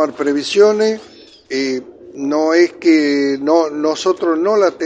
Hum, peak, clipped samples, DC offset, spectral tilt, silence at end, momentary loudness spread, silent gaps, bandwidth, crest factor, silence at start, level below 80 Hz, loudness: none; 0 dBFS; under 0.1%; under 0.1%; -4 dB/octave; 0 s; 11 LU; none; 9.2 kHz; 14 dB; 0 s; -62 dBFS; -15 LUFS